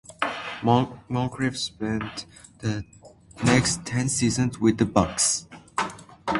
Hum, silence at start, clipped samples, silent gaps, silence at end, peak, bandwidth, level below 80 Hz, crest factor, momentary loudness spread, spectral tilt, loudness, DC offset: none; 0.1 s; under 0.1%; none; 0 s; -2 dBFS; 11.5 kHz; -48 dBFS; 22 dB; 12 LU; -4.5 dB/octave; -25 LUFS; under 0.1%